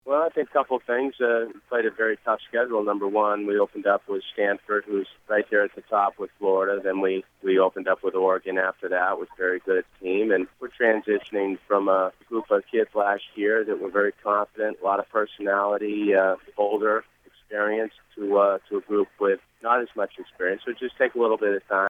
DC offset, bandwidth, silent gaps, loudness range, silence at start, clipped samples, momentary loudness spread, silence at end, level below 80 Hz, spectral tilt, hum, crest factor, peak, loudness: under 0.1%; 3.9 kHz; none; 1 LU; 0.05 s; under 0.1%; 6 LU; 0 s; -68 dBFS; -7 dB/octave; none; 18 dB; -6 dBFS; -25 LUFS